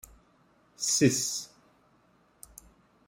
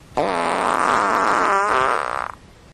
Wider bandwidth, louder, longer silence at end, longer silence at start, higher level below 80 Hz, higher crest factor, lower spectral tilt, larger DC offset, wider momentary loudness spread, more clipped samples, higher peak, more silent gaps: about the same, 16 kHz vs 15 kHz; second, -27 LUFS vs -19 LUFS; first, 1.6 s vs 0.4 s; first, 0.8 s vs 0.1 s; second, -66 dBFS vs -50 dBFS; first, 24 dB vs 16 dB; about the same, -3.5 dB/octave vs -3.5 dB/octave; neither; first, 26 LU vs 8 LU; neither; second, -8 dBFS vs -4 dBFS; neither